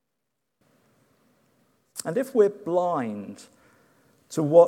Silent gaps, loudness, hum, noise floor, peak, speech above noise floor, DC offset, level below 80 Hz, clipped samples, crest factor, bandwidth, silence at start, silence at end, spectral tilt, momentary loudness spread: none; -25 LUFS; none; -81 dBFS; -4 dBFS; 59 dB; under 0.1%; -82 dBFS; under 0.1%; 22 dB; 15.5 kHz; 1.95 s; 0 s; -6.5 dB/octave; 17 LU